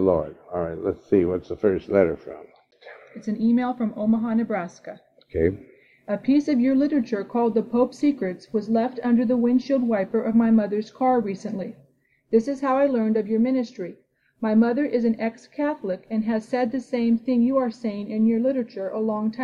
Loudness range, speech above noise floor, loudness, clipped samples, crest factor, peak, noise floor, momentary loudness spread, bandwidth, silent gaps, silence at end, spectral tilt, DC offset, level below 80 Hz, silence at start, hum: 3 LU; 39 dB; -23 LUFS; under 0.1%; 18 dB; -6 dBFS; -62 dBFS; 11 LU; 7.2 kHz; none; 0 s; -8 dB/octave; under 0.1%; -54 dBFS; 0 s; none